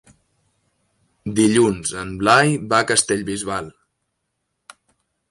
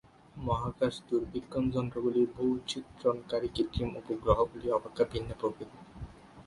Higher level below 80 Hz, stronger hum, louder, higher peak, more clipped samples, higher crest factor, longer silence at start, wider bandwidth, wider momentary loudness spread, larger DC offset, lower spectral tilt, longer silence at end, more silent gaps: about the same, -52 dBFS vs -48 dBFS; neither; first, -18 LUFS vs -32 LUFS; first, -2 dBFS vs -12 dBFS; neither; about the same, 20 dB vs 20 dB; first, 1.25 s vs 0.35 s; about the same, 11.5 kHz vs 11.5 kHz; second, 12 LU vs 17 LU; neither; second, -4 dB/octave vs -7 dB/octave; first, 1.6 s vs 0.05 s; neither